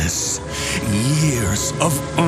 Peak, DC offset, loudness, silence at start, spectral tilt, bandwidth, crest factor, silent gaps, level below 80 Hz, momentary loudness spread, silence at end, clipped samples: 0 dBFS; under 0.1%; -19 LUFS; 0 s; -4 dB/octave; 15.5 kHz; 18 dB; none; -36 dBFS; 4 LU; 0 s; under 0.1%